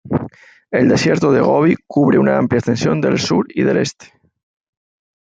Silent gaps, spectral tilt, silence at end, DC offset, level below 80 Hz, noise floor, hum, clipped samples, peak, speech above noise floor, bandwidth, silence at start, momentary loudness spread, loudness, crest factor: none; -6 dB/octave; 1.35 s; under 0.1%; -52 dBFS; -36 dBFS; none; under 0.1%; -2 dBFS; 21 dB; 9.2 kHz; 0.05 s; 9 LU; -15 LUFS; 14 dB